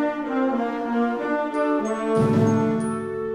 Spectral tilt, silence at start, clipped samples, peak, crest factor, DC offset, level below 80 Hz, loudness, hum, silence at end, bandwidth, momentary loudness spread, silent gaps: -7.5 dB/octave; 0 s; under 0.1%; -8 dBFS; 14 dB; under 0.1%; -56 dBFS; -23 LUFS; none; 0 s; 10.5 kHz; 6 LU; none